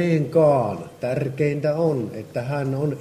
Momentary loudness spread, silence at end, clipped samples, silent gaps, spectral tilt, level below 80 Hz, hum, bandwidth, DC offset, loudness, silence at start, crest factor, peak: 11 LU; 0 s; under 0.1%; none; -8.5 dB/octave; -60 dBFS; none; 13.5 kHz; under 0.1%; -22 LUFS; 0 s; 14 dB; -6 dBFS